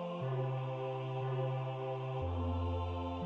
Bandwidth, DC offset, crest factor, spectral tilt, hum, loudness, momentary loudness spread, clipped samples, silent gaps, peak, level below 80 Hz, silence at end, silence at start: 5.2 kHz; under 0.1%; 12 dB; -9 dB/octave; none; -38 LUFS; 2 LU; under 0.1%; none; -26 dBFS; -52 dBFS; 0 s; 0 s